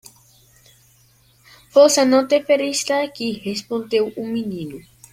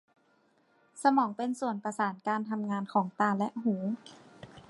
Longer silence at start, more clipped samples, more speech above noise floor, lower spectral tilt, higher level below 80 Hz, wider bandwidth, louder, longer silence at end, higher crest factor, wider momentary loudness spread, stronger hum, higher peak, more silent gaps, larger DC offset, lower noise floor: first, 1.75 s vs 0.95 s; neither; about the same, 37 dB vs 38 dB; second, -3.5 dB/octave vs -6 dB/octave; first, -62 dBFS vs -76 dBFS; first, 16 kHz vs 11.5 kHz; first, -18 LUFS vs -31 LUFS; first, 0.3 s vs 0.1 s; about the same, 18 dB vs 22 dB; first, 15 LU vs 9 LU; neither; first, -2 dBFS vs -12 dBFS; neither; neither; second, -55 dBFS vs -69 dBFS